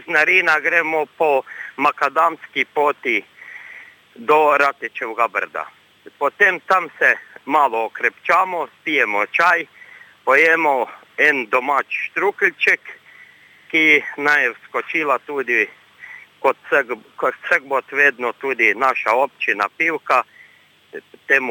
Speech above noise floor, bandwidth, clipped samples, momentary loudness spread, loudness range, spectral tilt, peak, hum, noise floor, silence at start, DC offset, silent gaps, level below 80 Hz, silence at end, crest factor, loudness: 33 dB; 19 kHz; under 0.1%; 14 LU; 3 LU; -3.5 dB/octave; -2 dBFS; none; -51 dBFS; 0.05 s; under 0.1%; none; -76 dBFS; 0 s; 18 dB; -17 LUFS